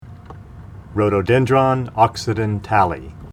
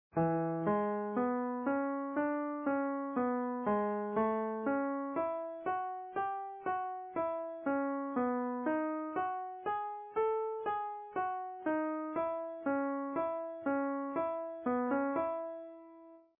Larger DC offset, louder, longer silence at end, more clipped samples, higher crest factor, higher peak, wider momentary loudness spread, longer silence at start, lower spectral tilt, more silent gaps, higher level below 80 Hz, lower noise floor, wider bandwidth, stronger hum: neither; first, -18 LUFS vs -36 LUFS; second, 0 s vs 0.2 s; neither; about the same, 18 dB vs 14 dB; first, 0 dBFS vs -20 dBFS; first, 23 LU vs 5 LU; about the same, 0.05 s vs 0.15 s; first, -7 dB/octave vs -2.5 dB/octave; neither; first, -42 dBFS vs -76 dBFS; second, -37 dBFS vs -57 dBFS; first, 13.5 kHz vs 3.5 kHz; neither